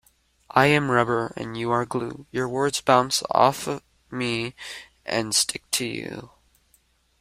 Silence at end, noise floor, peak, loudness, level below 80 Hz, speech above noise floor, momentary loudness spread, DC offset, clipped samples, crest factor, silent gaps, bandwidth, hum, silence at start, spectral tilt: 0.95 s; -64 dBFS; -2 dBFS; -23 LUFS; -60 dBFS; 40 dB; 16 LU; under 0.1%; under 0.1%; 22 dB; none; 16 kHz; none; 0.55 s; -3.5 dB/octave